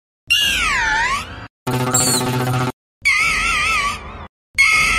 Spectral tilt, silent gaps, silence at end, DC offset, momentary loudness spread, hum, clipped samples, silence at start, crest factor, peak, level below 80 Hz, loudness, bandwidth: -2 dB/octave; 1.50-1.66 s, 2.73-3.01 s, 4.29-4.54 s; 0 s; under 0.1%; 11 LU; none; under 0.1%; 0.3 s; 16 dB; -4 dBFS; -38 dBFS; -16 LUFS; 16 kHz